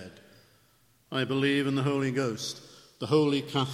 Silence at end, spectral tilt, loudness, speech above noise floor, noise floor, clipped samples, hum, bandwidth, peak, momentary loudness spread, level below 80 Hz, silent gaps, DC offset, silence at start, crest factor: 0 s; -5.5 dB/octave; -28 LUFS; 37 dB; -65 dBFS; under 0.1%; none; 14.5 kHz; -12 dBFS; 13 LU; -70 dBFS; none; under 0.1%; 0 s; 18 dB